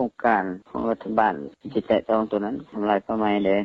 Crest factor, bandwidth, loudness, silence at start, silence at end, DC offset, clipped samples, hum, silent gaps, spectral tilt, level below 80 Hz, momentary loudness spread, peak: 18 dB; 5.8 kHz; -24 LUFS; 0 s; 0 s; under 0.1%; under 0.1%; none; none; -8.5 dB/octave; -58 dBFS; 8 LU; -6 dBFS